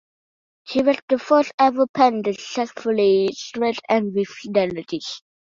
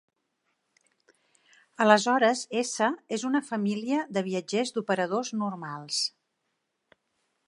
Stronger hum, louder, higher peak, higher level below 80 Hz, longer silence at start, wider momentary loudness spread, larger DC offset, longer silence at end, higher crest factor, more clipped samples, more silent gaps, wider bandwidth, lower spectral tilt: neither; first, -21 LUFS vs -27 LUFS; about the same, -2 dBFS vs -4 dBFS; first, -64 dBFS vs -82 dBFS; second, 0.65 s vs 1.8 s; about the same, 10 LU vs 10 LU; neither; second, 0.4 s vs 1.4 s; second, 18 dB vs 26 dB; neither; first, 1.02-1.08 s, 1.54-1.58 s, 1.89-1.94 s vs none; second, 7.6 kHz vs 11.5 kHz; about the same, -5 dB/octave vs -4 dB/octave